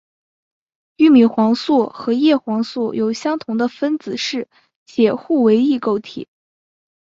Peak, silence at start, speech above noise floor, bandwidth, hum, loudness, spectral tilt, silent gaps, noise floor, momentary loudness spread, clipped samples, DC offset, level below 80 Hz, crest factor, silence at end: -2 dBFS; 1 s; over 74 dB; 7.6 kHz; none; -17 LUFS; -5.5 dB/octave; 4.76-4.86 s; under -90 dBFS; 11 LU; under 0.1%; under 0.1%; -64 dBFS; 16 dB; 0.8 s